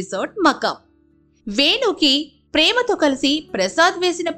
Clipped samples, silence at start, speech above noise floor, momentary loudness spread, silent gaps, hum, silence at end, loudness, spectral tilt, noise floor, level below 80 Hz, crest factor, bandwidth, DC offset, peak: under 0.1%; 0 s; 39 dB; 9 LU; none; none; 0 s; -17 LUFS; -2.5 dB/octave; -57 dBFS; -54 dBFS; 16 dB; 15.5 kHz; under 0.1%; -4 dBFS